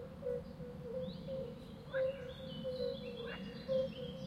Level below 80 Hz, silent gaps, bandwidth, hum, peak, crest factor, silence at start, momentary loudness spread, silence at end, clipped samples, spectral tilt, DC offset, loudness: -62 dBFS; none; 13.5 kHz; none; -26 dBFS; 16 dB; 0 s; 9 LU; 0 s; under 0.1%; -7 dB/octave; under 0.1%; -43 LUFS